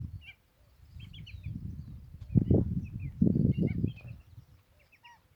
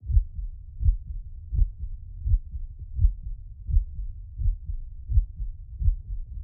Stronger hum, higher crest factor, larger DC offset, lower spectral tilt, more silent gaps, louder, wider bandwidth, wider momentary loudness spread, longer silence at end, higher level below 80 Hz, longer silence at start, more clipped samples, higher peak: neither; about the same, 22 dB vs 18 dB; neither; second, -10.5 dB/octave vs -16.5 dB/octave; neither; about the same, -31 LUFS vs -31 LUFS; first, 5.6 kHz vs 0.4 kHz; first, 22 LU vs 13 LU; first, 0.25 s vs 0 s; second, -48 dBFS vs -28 dBFS; about the same, 0 s vs 0 s; neither; about the same, -10 dBFS vs -8 dBFS